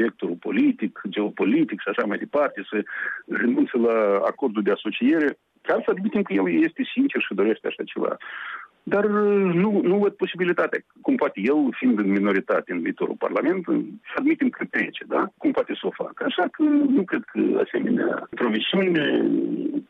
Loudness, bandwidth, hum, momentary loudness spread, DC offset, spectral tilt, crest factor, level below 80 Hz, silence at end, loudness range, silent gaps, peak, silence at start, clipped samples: -23 LUFS; 4.8 kHz; none; 8 LU; under 0.1%; -8.5 dB/octave; 12 dB; -72 dBFS; 0.05 s; 2 LU; none; -10 dBFS; 0 s; under 0.1%